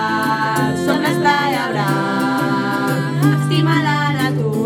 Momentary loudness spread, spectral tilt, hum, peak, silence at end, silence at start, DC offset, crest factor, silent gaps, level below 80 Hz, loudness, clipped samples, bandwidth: 3 LU; -6 dB/octave; none; -2 dBFS; 0 s; 0 s; under 0.1%; 14 dB; none; -60 dBFS; -17 LUFS; under 0.1%; 18 kHz